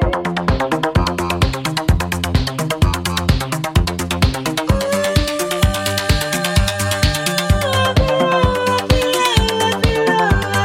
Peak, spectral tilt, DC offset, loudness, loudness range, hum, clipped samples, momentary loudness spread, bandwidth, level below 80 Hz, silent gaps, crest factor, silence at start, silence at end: 0 dBFS; -4.5 dB/octave; under 0.1%; -17 LUFS; 3 LU; none; under 0.1%; 4 LU; 17 kHz; -24 dBFS; none; 16 dB; 0 s; 0 s